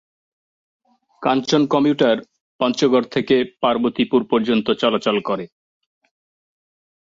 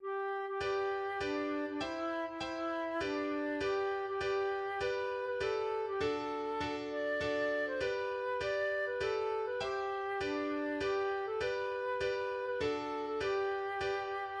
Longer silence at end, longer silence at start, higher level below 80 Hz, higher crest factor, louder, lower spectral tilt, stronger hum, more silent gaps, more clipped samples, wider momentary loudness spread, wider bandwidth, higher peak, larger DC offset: first, 1.65 s vs 0 s; first, 1.2 s vs 0 s; about the same, -62 dBFS vs -64 dBFS; first, 18 dB vs 12 dB; first, -19 LUFS vs -36 LUFS; about the same, -5.5 dB/octave vs -5 dB/octave; neither; first, 2.40-2.59 s vs none; neither; first, 7 LU vs 3 LU; second, 7.8 kHz vs 9.4 kHz; first, -2 dBFS vs -24 dBFS; neither